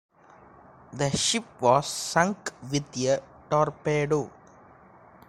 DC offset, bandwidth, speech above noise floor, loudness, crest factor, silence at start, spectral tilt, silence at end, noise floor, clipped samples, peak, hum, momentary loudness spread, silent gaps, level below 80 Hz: under 0.1%; 16 kHz; 27 dB; -26 LUFS; 22 dB; 0.9 s; -4 dB/octave; 1 s; -53 dBFS; under 0.1%; -6 dBFS; none; 8 LU; none; -58 dBFS